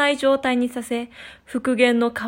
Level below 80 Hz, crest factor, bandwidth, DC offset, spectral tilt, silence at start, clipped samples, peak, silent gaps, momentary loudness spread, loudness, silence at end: -58 dBFS; 16 dB; 16.5 kHz; under 0.1%; -4 dB/octave; 0 s; under 0.1%; -4 dBFS; none; 14 LU; -21 LUFS; 0 s